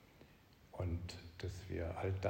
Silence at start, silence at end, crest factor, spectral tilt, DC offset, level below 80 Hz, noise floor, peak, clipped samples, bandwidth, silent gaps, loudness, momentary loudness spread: 0 s; 0 s; 20 dB; -6.5 dB/octave; under 0.1%; -60 dBFS; -65 dBFS; -24 dBFS; under 0.1%; 16 kHz; none; -45 LUFS; 22 LU